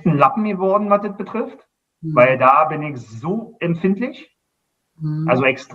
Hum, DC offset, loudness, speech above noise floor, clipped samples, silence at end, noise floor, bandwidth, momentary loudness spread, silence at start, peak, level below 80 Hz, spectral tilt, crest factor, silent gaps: none; under 0.1%; -18 LUFS; 55 dB; under 0.1%; 0 s; -73 dBFS; 7.8 kHz; 15 LU; 0.05 s; 0 dBFS; -62 dBFS; -8 dB/octave; 18 dB; none